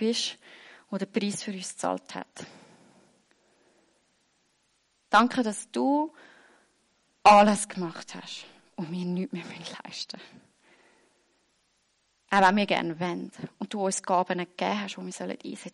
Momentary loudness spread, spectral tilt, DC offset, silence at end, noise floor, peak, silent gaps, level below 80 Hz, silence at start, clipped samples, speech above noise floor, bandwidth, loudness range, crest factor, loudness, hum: 19 LU; -4 dB/octave; under 0.1%; 0.05 s; -71 dBFS; -8 dBFS; none; -68 dBFS; 0 s; under 0.1%; 44 dB; 11.5 kHz; 14 LU; 20 dB; -27 LUFS; none